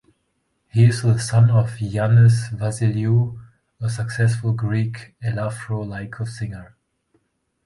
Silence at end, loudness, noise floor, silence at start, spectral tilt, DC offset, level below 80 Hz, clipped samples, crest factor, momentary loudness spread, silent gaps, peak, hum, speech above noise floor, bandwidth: 1 s; -20 LUFS; -70 dBFS; 0.75 s; -7 dB/octave; under 0.1%; -50 dBFS; under 0.1%; 16 dB; 13 LU; none; -4 dBFS; none; 52 dB; 11.5 kHz